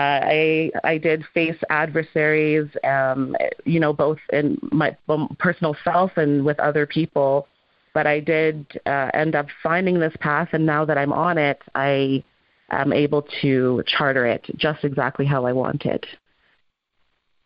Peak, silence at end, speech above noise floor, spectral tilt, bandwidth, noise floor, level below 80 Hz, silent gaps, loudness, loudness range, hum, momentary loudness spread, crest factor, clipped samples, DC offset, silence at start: -6 dBFS; 1.3 s; 48 dB; -10.5 dB/octave; 5.6 kHz; -68 dBFS; -58 dBFS; none; -21 LUFS; 1 LU; none; 5 LU; 16 dB; under 0.1%; under 0.1%; 0 s